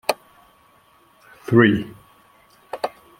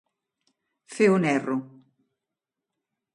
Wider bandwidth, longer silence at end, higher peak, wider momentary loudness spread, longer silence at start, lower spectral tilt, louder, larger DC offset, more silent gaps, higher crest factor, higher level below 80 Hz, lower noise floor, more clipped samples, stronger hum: first, 16.5 kHz vs 11 kHz; second, 0.3 s vs 1.45 s; first, -2 dBFS vs -8 dBFS; first, 22 LU vs 13 LU; second, 0.1 s vs 0.9 s; about the same, -6.5 dB/octave vs -6.5 dB/octave; first, -20 LUFS vs -24 LUFS; neither; neither; about the same, 22 dB vs 20 dB; first, -58 dBFS vs -74 dBFS; second, -56 dBFS vs -87 dBFS; neither; neither